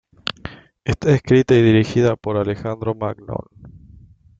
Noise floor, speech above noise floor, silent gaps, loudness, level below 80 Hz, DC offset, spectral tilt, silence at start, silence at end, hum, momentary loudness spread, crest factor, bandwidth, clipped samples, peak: -46 dBFS; 29 dB; none; -18 LUFS; -44 dBFS; under 0.1%; -7.5 dB/octave; 0.25 s; 0.7 s; none; 17 LU; 18 dB; 7.6 kHz; under 0.1%; -2 dBFS